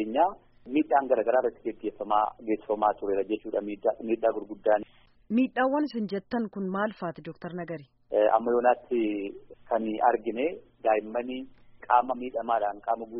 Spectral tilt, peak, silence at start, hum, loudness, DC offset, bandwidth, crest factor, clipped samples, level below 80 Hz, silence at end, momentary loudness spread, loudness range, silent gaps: -4.5 dB/octave; -8 dBFS; 0 s; none; -28 LUFS; under 0.1%; 5.2 kHz; 20 dB; under 0.1%; -64 dBFS; 0 s; 12 LU; 2 LU; none